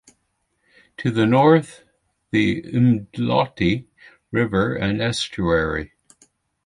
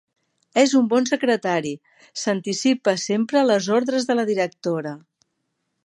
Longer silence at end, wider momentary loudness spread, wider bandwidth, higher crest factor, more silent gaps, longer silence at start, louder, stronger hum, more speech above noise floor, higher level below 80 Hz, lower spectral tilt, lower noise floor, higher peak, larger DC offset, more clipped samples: about the same, 0.8 s vs 0.9 s; about the same, 11 LU vs 11 LU; about the same, 11.5 kHz vs 11.5 kHz; about the same, 18 dB vs 18 dB; neither; first, 1 s vs 0.55 s; about the same, -20 LUFS vs -21 LUFS; neither; about the same, 52 dB vs 54 dB; first, -44 dBFS vs -72 dBFS; first, -6.5 dB/octave vs -4 dB/octave; second, -71 dBFS vs -75 dBFS; about the same, -4 dBFS vs -4 dBFS; neither; neither